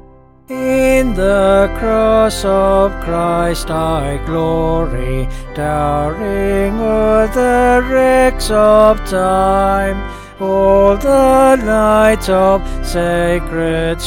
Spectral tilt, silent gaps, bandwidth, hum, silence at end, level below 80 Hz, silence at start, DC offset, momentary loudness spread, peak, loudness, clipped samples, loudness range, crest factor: -6 dB/octave; none; 17 kHz; none; 0 s; -24 dBFS; 0.5 s; under 0.1%; 9 LU; 0 dBFS; -13 LUFS; under 0.1%; 5 LU; 12 dB